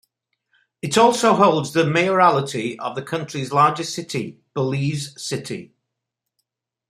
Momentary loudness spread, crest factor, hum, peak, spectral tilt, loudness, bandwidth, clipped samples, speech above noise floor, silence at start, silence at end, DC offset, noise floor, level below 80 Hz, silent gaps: 13 LU; 20 dB; none; 0 dBFS; -5 dB/octave; -20 LUFS; 15.5 kHz; under 0.1%; 62 dB; 0.85 s; 1.25 s; under 0.1%; -82 dBFS; -64 dBFS; none